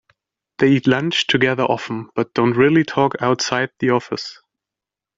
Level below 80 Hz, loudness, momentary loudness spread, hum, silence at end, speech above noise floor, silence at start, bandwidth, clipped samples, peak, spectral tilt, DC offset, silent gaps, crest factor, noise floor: -58 dBFS; -18 LUFS; 9 LU; none; 0.85 s; 69 dB; 0.6 s; 7.8 kHz; under 0.1%; -2 dBFS; -5 dB/octave; under 0.1%; none; 16 dB; -87 dBFS